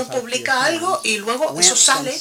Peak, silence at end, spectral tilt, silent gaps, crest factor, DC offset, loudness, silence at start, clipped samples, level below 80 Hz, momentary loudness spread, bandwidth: 0 dBFS; 0 s; -0.5 dB/octave; none; 18 dB; under 0.1%; -16 LUFS; 0 s; under 0.1%; -68 dBFS; 10 LU; 16.5 kHz